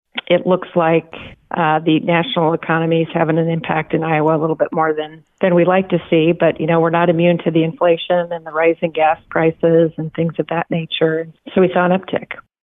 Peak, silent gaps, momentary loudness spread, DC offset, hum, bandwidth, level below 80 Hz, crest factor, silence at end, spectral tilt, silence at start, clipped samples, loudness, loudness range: -4 dBFS; none; 7 LU; under 0.1%; none; 3.9 kHz; -56 dBFS; 12 dB; 0.25 s; -10 dB/octave; 0.15 s; under 0.1%; -16 LUFS; 2 LU